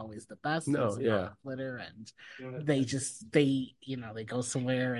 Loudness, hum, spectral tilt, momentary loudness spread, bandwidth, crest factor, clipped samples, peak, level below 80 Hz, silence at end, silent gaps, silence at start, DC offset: -32 LUFS; none; -5.5 dB/octave; 15 LU; 11.5 kHz; 22 dB; under 0.1%; -12 dBFS; -64 dBFS; 0 s; none; 0 s; under 0.1%